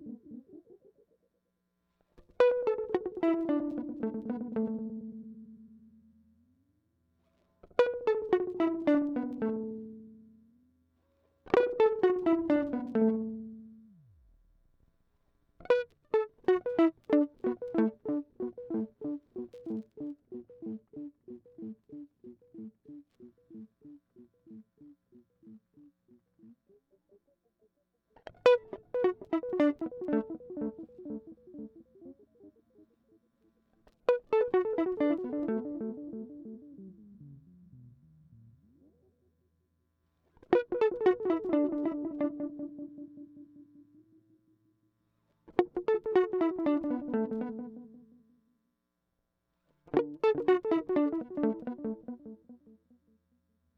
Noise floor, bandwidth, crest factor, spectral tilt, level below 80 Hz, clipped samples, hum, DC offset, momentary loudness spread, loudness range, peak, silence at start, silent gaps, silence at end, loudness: -82 dBFS; 7 kHz; 24 dB; -7.5 dB/octave; -70 dBFS; under 0.1%; none; under 0.1%; 23 LU; 15 LU; -10 dBFS; 0 s; none; 1.2 s; -31 LUFS